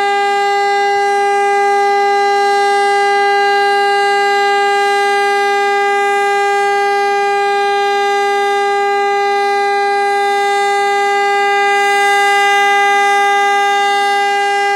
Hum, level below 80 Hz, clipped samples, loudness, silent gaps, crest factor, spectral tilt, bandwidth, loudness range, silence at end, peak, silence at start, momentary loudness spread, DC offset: none; -62 dBFS; under 0.1%; -12 LUFS; none; 12 dB; -0.5 dB/octave; 15 kHz; 2 LU; 0 s; 0 dBFS; 0 s; 3 LU; under 0.1%